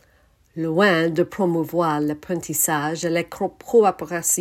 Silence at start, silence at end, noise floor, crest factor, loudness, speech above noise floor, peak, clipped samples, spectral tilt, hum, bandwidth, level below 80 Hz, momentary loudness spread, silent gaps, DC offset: 0.55 s; 0 s; -58 dBFS; 18 dB; -21 LUFS; 37 dB; -4 dBFS; under 0.1%; -4 dB/octave; none; 16.5 kHz; -60 dBFS; 10 LU; none; under 0.1%